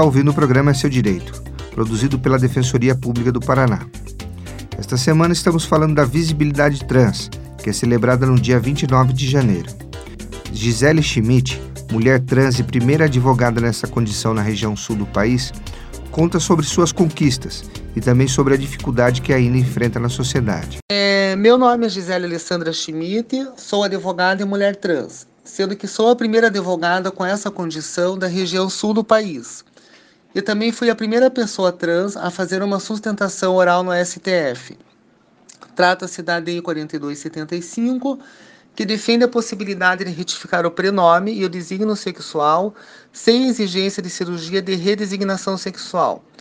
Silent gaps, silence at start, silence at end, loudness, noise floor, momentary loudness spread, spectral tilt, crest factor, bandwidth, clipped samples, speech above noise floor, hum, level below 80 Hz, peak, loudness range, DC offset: 20.82-20.88 s; 0 s; 0.2 s; -18 LUFS; -54 dBFS; 12 LU; -5.5 dB/octave; 18 dB; 14.5 kHz; under 0.1%; 37 dB; none; -38 dBFS; 0 dBFS; 4 LU; under 0.1%